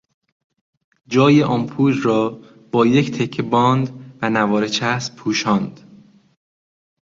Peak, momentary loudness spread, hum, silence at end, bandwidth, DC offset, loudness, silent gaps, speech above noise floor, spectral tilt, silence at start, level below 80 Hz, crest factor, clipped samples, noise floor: -2 dBFS; 9 LU; none; 1.35 s; 7.6 kHz; under 0.1%; -18 LUFS; none; 31 dB; -6 dB/octave; 1.1 s; -58 dBFS; 18 dB; under 0.1%; -48 dBFS